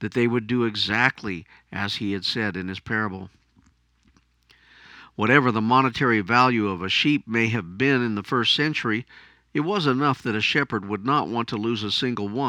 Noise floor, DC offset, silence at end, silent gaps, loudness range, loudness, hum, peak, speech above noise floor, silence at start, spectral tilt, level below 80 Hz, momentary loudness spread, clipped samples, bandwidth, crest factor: -61 dBFS; under 0.1%; 0 s; none; 9 LU; -23 LUFS; none; -2 dBFS; 38 dB; 0 s; -5.5 dB/octave; -60 dBFS; 10 LU; under 0.1%; 11 kHz; 22 dB